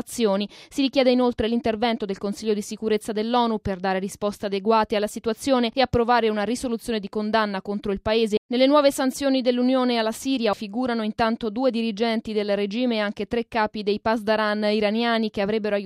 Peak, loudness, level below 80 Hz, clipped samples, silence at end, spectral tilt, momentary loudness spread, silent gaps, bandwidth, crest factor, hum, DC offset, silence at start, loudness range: -6 dBFS; -23 LUFS; -50 dBFS; under 0.1%; 0 s; -5 dB/octave; 7 LU; 8.38-8.49 s; 15.5 kHz; 16 dB; none; under 0.1%; 0.05 s; 3 LU